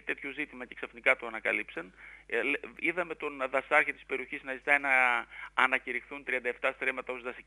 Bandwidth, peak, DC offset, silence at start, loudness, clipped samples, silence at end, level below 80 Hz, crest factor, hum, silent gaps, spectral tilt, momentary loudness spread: 11.5 kHz; -8 dBFS; under 0.1%; 0.05 s; -30 LUFS; under 0.1%; 0.05 s; -66 dBFS; 24 dB; none; none; -3.5 dB/octave; 13 LU